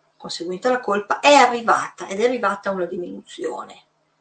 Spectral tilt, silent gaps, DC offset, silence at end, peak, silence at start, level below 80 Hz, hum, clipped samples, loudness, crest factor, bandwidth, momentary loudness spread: -3 dB/octave; none; under 0.1%; 0.45 s; 0 dBFS; 0.2 s; -70 dBFS; none; under 0.1%; -20 LUFS; 20 dB; 9 kHz; 18 LU